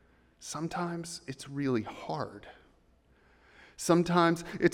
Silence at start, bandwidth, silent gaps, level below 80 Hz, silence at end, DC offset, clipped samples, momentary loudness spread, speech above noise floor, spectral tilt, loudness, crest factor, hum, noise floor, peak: 0.4 s; 15.5 kHz; none; -64 dBFS; 0 s; under 0.1%; under 0.1%; 15 LU; 34 dB; -5.5 dB/octave; -32 LUFS; 22 dB; none; -65 dBFS; -12 dBFS